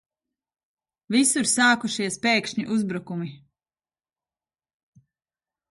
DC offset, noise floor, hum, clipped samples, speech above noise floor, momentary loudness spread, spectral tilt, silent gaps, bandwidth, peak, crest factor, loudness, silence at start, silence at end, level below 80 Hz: under 0.1%; under -90 dBFS; none; under 0.1%; over 67 dB; 13 LU; -2.5 dB/octave; none; 11.5 kHz; -6 dBFS; 20 dB; -22 LUFS; 1.1 s; 2.35 s; -70 dBFS